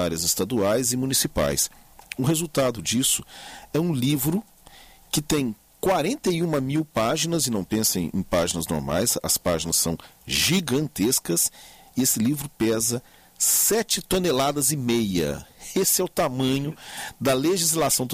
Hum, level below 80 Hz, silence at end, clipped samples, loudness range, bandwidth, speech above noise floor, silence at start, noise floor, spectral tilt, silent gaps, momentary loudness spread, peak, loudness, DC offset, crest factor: none; -48 dBFS; 0 s; under 0.1%; 3 LU; 15.5 kHz; 26 dB; 0 s; -49 dBFS; -3.5 dB/octave; none; 7 LU; -8 dBFS; -23 LUFS; under 0.1%; 16 dB